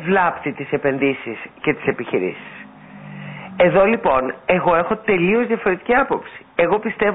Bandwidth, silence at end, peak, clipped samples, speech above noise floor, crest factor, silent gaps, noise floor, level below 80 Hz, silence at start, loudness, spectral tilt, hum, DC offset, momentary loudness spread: 4 kHz; 0 s; -4 dBFS; under 0.1%; 20 dB; 16 dB; none; -39 dBFS; -50 dBFS; 0 s; -19 LUFS; -11.5 dB/octave; none; under 0.1%; 18 LU